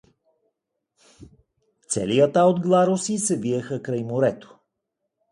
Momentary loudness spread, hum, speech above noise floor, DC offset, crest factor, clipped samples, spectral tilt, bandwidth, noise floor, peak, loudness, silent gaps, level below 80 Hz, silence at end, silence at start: 10 LU; none; 59 dB; under 0.1%; 20 dB; under 0.1%; -5.5 dB/octave; 11.5 kHz; -80 dBFS; -4 dBFS; -22 LUFS; none; -62 dBFS; 0.9 s; 1.2 s